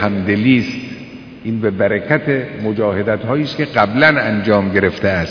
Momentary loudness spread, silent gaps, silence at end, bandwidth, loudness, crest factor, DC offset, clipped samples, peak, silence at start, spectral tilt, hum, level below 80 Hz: 13 LU; none; 0 s; 5.4 kHz; -15 LUFS; 16 dB; under 0.1%; under 0.1%; 0 dBFS; 0 s; -7.5 dB/octave; none; -46 dBFS